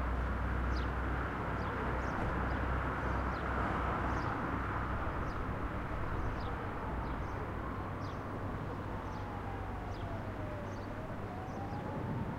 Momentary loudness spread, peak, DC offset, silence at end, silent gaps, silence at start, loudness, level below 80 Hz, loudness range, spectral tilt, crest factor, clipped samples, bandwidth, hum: 6 LU; -22 dBFS; under 0.1%; 0 s; none; 0 s; -38 LUFS; -42 dBFS; 5 LU; -7.5 dB/octave; 14 dB; under 0.1%; 10 kHz; none